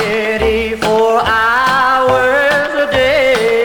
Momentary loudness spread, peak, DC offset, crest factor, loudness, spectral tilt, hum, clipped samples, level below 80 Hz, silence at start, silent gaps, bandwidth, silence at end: 3 LU; 0 dBFS; under 0.1%; 12 dB; -12 LUFS; -4 dB/octave; none; under 0.1%; -34 dBFS; 0 s; none; 19 kHz; 0 s